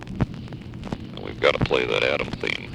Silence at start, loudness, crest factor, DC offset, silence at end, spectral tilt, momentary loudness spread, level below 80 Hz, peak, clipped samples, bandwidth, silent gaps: 0 s; -24 LUFS; 22 dB; under 0.1%; 0 s; -5.5 dB/octave; 15 LU; -42 dBFS; -4 dBFS; under 0.1%; 11.5 kHz; none